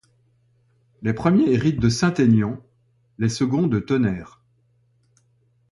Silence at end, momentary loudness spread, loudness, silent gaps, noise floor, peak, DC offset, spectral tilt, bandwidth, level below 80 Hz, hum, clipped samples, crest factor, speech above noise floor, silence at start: 1.5 s; 10 LU; -21 LUFS; none; -63 dBFS; -6 dBFS; under 0.1%; -6.5 dB/octave; 11.5 kHz; -48 dBFS; none; under 0.1%; 18 dB; 44 dB; 1 s